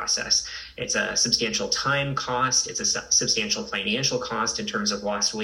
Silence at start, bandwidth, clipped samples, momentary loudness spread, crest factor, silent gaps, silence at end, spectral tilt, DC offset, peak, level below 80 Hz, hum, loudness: 0 s; 16 kHz; under 0.1%; 5 LU; 18 dB; none; 0 s; -1.5 dB/octave; under 0.1%; -6 dBFS; -54 dBFS; none; -23 LUFS